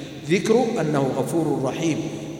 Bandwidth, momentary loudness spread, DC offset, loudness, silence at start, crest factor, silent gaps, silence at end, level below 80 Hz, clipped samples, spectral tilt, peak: 17 kHz; 5 LU; under 0.1%; -22 LUFS; 0 s; 16 dB; none; 0 s; -58 dBFS; under 0.1%; -6 dB/octave; -6 dBFS